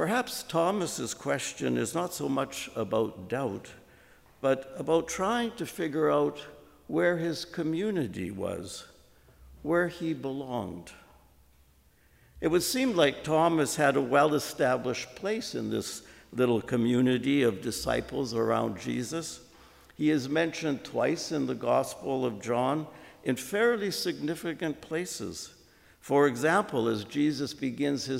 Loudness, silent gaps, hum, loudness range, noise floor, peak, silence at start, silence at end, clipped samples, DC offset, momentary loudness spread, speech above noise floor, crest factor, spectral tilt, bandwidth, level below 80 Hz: -29 LUFS; none; none; 6 LU; -62 dBFS; -10 dBFS; 0 s; 0 s; under 0.1%; under 0.1%; 10 LU; 33 dB; 20 dB; -4.5 dB/octave; 16 kHz; -60 dBFS